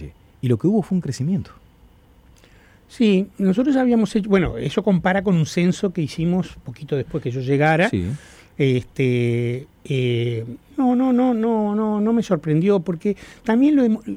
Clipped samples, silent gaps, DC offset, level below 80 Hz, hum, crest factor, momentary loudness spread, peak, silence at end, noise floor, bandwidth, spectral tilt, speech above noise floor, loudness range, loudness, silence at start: under 0.1%; none; under 0.1%; -48 dBFS; none; 14 dB; 9 LU; -6 dBFS; 0 s; -51 dBFS; 11.5 kHz; -7.5 dB/octave; 32 dB; 3 LU; -20 LUFS; 0 s